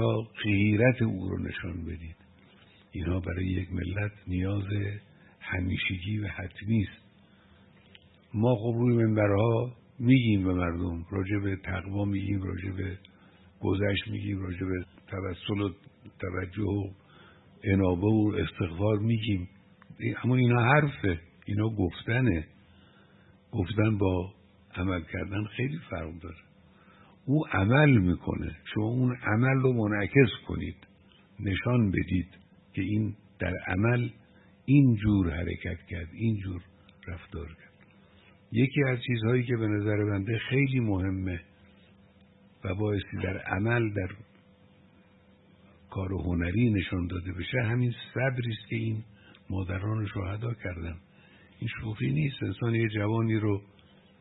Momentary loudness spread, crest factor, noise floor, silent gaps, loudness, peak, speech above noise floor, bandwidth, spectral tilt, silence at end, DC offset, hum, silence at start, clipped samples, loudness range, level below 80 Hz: 14 LU; 22 dB; -59 dBFS; none; -29 LUFS; -6 dBFS; 31 dB; 4.1 kHz; -11.5 dB/octave; 0.55 s; under 0.1%; none; 0 s; under 0.1%; 7 LU; -52 dBFS